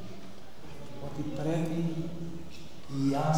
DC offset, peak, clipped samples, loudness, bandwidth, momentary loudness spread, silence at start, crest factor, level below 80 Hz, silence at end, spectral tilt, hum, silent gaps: 2%; -16 dBFS; under 0.1%; -34 LUFS; 18 kHz; 17 LU; 0 s; 18 dB; -58 dBFS; 0 s; -7 dB/octave; none; none